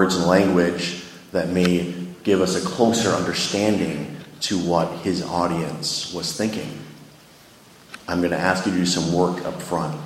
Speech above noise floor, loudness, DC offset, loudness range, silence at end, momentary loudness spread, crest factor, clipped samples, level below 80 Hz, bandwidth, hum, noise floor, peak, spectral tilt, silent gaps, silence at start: 27 dB; -22 LUFS; under 0.1%; 5 LU; 0 s; 11 LU; 22 dB; under 0.1%; -54 dBFS; 16 kHz; none; -48 dBFS; 0 dBFS; -4.5 dB/octave; none; 0 s